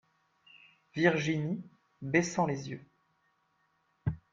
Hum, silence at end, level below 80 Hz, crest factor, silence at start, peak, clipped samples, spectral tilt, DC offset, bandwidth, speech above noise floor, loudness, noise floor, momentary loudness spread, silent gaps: none; 0.15 s; -62 dBFS; 26 dB; 0.95 s; -10 dBFS; under 0.1%; -5.5 dB/octave; under 0.1%; 7.8 kHz; 44 dB; -32 LUFS; -74 dBFS; 16 LU; none